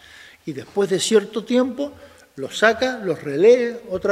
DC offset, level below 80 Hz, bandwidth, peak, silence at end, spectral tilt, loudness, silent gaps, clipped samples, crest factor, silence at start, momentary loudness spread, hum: under 0.1%; -60 dBFS; 15 kHz; 0 dBFS; 0 s; -4 dB/octave; -20 LUFS; none; under 0.1%; 20 dB; 0.45 s; 17 LU; none